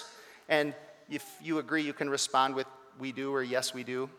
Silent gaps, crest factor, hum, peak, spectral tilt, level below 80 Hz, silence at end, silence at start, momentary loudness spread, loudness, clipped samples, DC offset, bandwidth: none; 22 dB; none; -10 dBFS; -3 dB/octave; -88 dBFS; 0 s; 0 s; 14 LU; -32 LUFS; under 0.1%; under 0.1%; 17.5 kHz